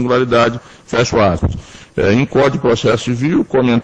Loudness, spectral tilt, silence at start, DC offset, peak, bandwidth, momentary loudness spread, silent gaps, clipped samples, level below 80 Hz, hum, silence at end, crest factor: -14 LUFS; -6 dB/octave; 0 s; under 0.1%; 0 dBFS; 9.2 kHz; 8 LU; none; under 0.1%; -34 dBFS; none; 0 s; 14 dB